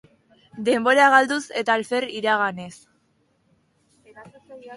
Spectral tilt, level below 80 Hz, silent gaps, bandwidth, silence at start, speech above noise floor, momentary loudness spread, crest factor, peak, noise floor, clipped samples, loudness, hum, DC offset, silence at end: -3.5 dB/octave; -70 dBFS; none; 11.5 kHz; 0.55 s; 46 dB; 13 LU; 22 dB; -2 dBFS; -66 dBFS; under 0.1%; -20 LUFS; none; under 0.1%; 0 s